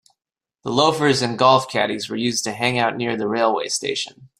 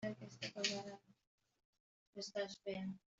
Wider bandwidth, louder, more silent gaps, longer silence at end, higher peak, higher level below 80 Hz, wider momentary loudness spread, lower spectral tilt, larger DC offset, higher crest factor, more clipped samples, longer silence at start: first, 15.5 kHz vs 8.2 kHz; first, -20 LUFS vs -45 LUFS; second, none vs 1.27-1.38 s, 1.65-1.73 s, 1.80-2.13 s; about the same, 0.15 s vs 0.2 s; first, -2 dBFS vs -22 dBFS; first, -62 dBFS vs -84 dBFS; second, 8 LU vs 14 LU; about the same, -3.5 dB/octave vs -3.5 dB/octave; neither; second, 20 dB vs 26 dB; neither; first, 0.65 s vs 0 s